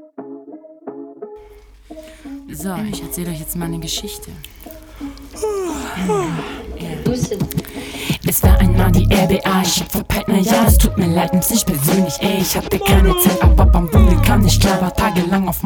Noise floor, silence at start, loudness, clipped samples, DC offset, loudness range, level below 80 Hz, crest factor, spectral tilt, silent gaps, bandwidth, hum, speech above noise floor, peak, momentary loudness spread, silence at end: -42 dBFS; 0.2 s; -16 LUFS; under 0.1%; under 0.1%; 12 LU; -20 dBFS; 16 dB; -5 dB/octave; none; over 20 kHz; none; 27 dB; 0 dBFS; 22 LU; 0 s